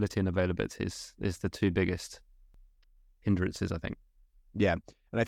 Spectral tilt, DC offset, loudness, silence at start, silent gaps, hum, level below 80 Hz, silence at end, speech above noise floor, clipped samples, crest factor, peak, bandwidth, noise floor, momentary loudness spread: -6.5 dB/octave; under 0.1%; -32 LUFS; 0 s; none; none; -52 dBFS; 0 s; 32 dB; under 0.1%; 18 dB; -14 dBFS; 14 kHz; -63 dBFS; 12 LU